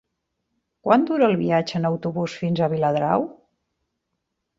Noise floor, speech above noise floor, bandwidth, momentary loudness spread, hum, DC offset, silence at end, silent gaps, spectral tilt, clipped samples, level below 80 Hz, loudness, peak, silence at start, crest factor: -78 dBFS; 57 dB; 7.6 kHz; 8 LU; none; under 0.1%; 1.25 s; none; -7.5 dB/octave; under 0.1%; -62 dBFS; -22 LUFS; -4 dBFS; 0.85 s; 20 dB